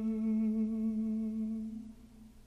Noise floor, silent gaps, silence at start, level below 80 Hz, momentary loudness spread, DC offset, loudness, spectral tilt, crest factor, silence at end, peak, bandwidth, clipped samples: -55 dBFS; none; 0 s; -60 dBFS; 13 LU; under 0.1%; -35 LUFS; -9.5 dB/octave; 10 dB; 0.05 s; -26 dBFS; 2.8 kHz; under 0.1%